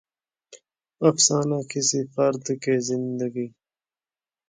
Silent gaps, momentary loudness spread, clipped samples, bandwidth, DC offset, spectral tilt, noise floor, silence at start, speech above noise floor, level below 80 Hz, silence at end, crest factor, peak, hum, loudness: none; 10 LU; under 0.1%; 9.8 kHz; under 0.1%; -4 dB/octave; under -90 dBFS; 0.5 s; over 67 dB; -72 dBFS; 1 s; 20 dB; -4 dBFS; none; -23 LUFS